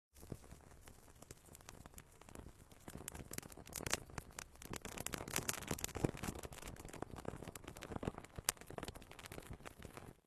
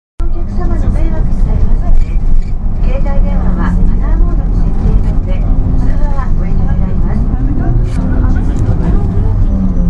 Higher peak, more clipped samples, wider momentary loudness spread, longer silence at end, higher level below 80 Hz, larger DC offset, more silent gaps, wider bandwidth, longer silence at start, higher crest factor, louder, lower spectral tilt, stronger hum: second, -8 dBFS vs 0 dBFS; second, under 0.1% vs 0.1%; first, 18 LU vs 3 LU; about the same, 0.05 s vs 0 s; second, -60 dBFS vs -10 dBFS; neither; neither; first, 13.5 kHz vs 3.2 kHz; about the same, 0.15 s vs 0.2 s; first, 40 dB vs 8 dB; second, -47 LUFS vs -15 LUFS; second, -3.5 dB/octave vs -9.5 dB/octave; neither